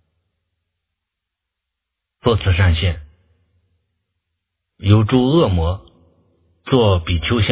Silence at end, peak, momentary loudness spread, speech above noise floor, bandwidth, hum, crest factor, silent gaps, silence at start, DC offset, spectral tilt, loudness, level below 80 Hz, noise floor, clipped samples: 0 s; 0 dBFS; 11 LU; 66 dB; 4 kHz; none; 20 dB; none; 2.25 s; under 0.1%; -11 dB/octave; -17 LUFS; -30 dBFS; -81 dBFS; under 0.1%